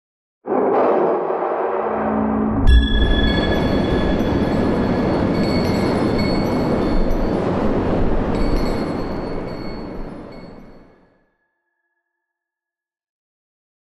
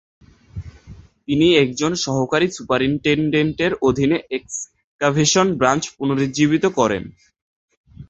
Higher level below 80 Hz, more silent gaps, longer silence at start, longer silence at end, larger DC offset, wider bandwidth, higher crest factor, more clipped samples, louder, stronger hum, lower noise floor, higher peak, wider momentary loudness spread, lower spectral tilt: first, -24 dBFS vs -48 dBFS; second, none vs 4.84-4.99 s, 7.42-7.68 s, 7.77-7.84 s; about the same, 0.45 s vs 0.55 s; first, 3.2 s vs 0.05 s; neither; first, 12.5 kHz vs 8.2 kHz; about the same, 16 dB vs 18 dB; neither; about the same, -19 LUFS vs -18 LUFS; neither; first, -89 dBFS vs -43 dBFS; about the same, -2 dBFS vs -2 dBFS; second, 13 LU vs 17 LU; first, -7.5 dB/octave vs -4.5 dB/octave